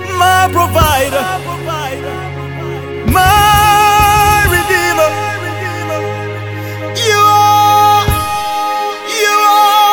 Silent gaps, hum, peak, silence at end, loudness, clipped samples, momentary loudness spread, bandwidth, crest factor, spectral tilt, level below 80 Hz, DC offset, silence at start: none; none; 0 dBFS; 0 s; -11 LUFS; under 0.1%; 14 LU; over 20 kHz; 12 dB; -3.5 dB/octave; -28 dBFS; under 0.1%; 0 s